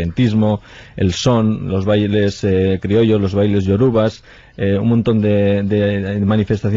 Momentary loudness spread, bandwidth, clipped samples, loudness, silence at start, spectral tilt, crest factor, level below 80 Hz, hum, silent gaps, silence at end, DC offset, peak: 5 LU; 7.6 kHz; under 0.1%; -16 LUFS; 0 s; -7.5 dB/octave; 12 dB; -34 dBFS; none; none; 0 s; under 0.1%; -4 dBFS